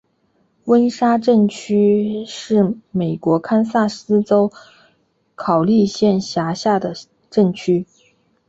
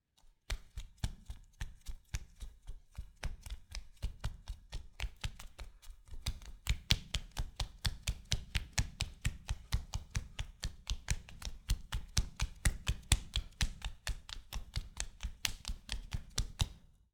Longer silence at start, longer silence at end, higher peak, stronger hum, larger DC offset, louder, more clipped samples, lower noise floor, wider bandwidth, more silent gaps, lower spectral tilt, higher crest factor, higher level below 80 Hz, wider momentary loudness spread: first, 0.65 s vs 0.25 s; first, 0.65 s vs 0.35 s; first, -2 dBFS vs -6 dBFS; neither; neither; first, -17 LUFS vs -41 LUFS; neither; second, -62 dBFS vs -66 dBFS; second, 8 kHz vs over 20 kHz; neither; first, -7 dB/octave vs -2.5 dB/octave; second, 14 dB vs 34 dB; second, -58 dBFS vs -42 dBFS; second, 8 LU vs 16 LU